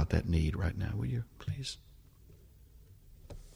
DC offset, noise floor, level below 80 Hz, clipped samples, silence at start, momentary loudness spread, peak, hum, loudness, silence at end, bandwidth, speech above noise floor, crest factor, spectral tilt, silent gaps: under 0.1%; -58 dBFS; -42 dBFS; under 0.1%; 0 s; 19 LU; -16 dBFS; none; -35 LUFS; 0 s; 16 kHz; 24 dB; 20 dB; -6.5 dB/octave; none